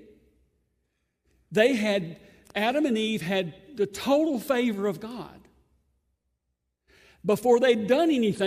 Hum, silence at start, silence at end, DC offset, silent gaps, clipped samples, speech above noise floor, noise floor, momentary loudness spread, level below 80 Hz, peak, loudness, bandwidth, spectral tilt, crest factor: none; 1.5 s; 0 s; under 0.1%; none; under 0.1%; 55 dB; -80 dBFS; 15 LU; -66 dBFS; -8 dBFS; -25 LUFS; 15.5 kHz; -5 dB/octave; 18 dB